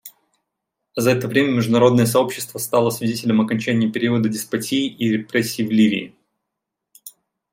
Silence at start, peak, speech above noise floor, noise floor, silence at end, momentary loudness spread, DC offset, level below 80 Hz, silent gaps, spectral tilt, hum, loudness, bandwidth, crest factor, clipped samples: 0.05 s; -2 dBFS; 63 dB; -81 dBFS; 0.45 s; 8 LU; under 0.1%; -62 dBFS; none; -5.5 dB/octave; none; -19 LUFS; 16.5 kHz; 18 dB; under 0.1%